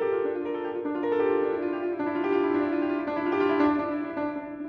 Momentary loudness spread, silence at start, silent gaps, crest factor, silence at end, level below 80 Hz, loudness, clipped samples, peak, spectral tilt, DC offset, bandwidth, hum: 7 LU; 0 s; none; 16 dB; 0 s; -64 dBFS; -27 LUFS; under 0.1%; -10 dBFS; -8 dB/octave; under 0.1%; 5.4 kHz; none